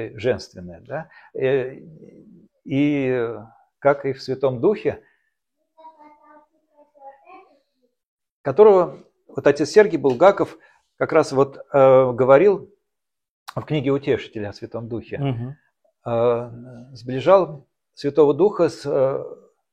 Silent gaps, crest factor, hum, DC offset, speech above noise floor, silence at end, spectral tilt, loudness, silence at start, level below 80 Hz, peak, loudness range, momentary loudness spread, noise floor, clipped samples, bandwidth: 8.05-8.18 s, 8.31-8.44 s, 13.29-13.46 s; 20 dB; none; under 0.1%; 64 dB; 0.4 s; -7 dB/octave; -19 LUFS; 0 s; -58 dBFS; 0 dBFS; 9 LU; 19 LU; -83 dBFS; under 0.1%; 9.6 kHz